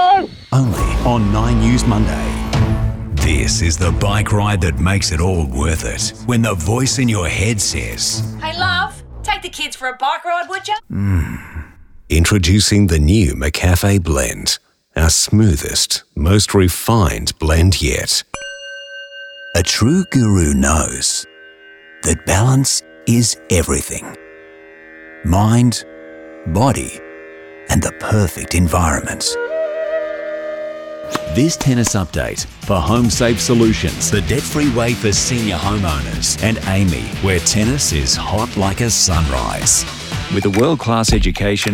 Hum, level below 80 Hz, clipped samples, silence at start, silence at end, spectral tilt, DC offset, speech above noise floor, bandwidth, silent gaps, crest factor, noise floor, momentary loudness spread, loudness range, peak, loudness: none; -26 dBFS; under 0.1%; 0 s; 0 s; -4.5 dB/octave; under 0.1%; 26 dB; 18 kHz; none; 14 dB; -41 dBFS; 11 LU; 4 LU; -2 dBFS; -16 LUFS